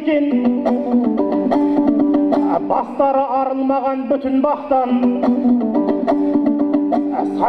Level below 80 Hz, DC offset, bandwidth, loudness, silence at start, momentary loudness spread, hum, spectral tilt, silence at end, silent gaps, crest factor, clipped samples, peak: -52 dBFS; under 0.1%; 5.2 kHz; -17 LUFS; 0 s; 3 LU; none; -8.5 dB/octave; 0 s; none; 14 dB; under 0.1%; -2 dBFS